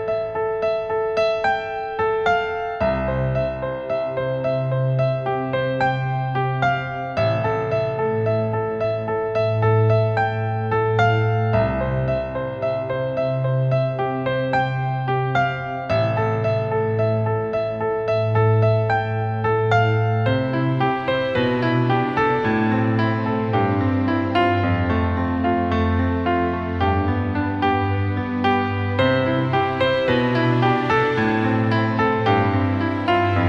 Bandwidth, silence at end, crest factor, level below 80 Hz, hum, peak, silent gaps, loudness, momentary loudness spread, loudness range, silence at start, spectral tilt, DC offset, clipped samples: 7 kHz; 0 s; 16 dB; -42 dBFS; none; -4 dBFS; none; -21 LUFS; 5 LU; 3 LU; 0 s; -8.5 dB/octave; under 0.1%; under 0.1%